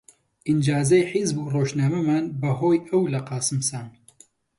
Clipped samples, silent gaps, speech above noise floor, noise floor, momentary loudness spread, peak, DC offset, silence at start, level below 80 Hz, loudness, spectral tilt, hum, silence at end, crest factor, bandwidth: under 0.1%; none; 33 dB; -55 dBFS; 7 LU; -8 dBFS; under 0.1%; 0.45 s; -60 dBFS; -23 LUFS; -6 dB/octave; none; 0.7 s; 16 dB; 11.5 kHz